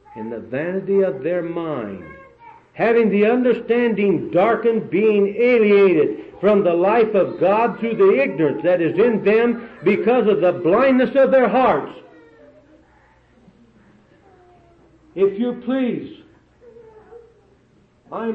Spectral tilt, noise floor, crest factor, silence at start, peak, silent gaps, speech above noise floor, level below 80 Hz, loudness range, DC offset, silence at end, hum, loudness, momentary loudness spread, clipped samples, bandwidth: -9 dB/octave; -56 dBFS; 12 dB; 0.15 s; -6 dBFS; none; 39 dB; -58 dBFS; 10 LU; under 0.1%; 0 s; none; -17 LUFS; 11 LU; under 0.1%; 5.2 kHz